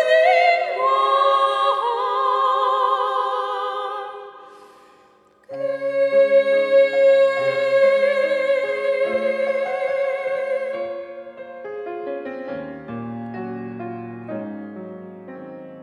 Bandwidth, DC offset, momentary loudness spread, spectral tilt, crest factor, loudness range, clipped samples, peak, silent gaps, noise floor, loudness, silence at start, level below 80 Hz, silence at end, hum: 10 kHz; under 0.1%; 20 LU; -5 dB/octave; 16 dB; 14 LU; under 0.1%; -4 dBFS; none; -54 dBFS; -19 LUFS; 0 s; -74 dBFS; 0 s; none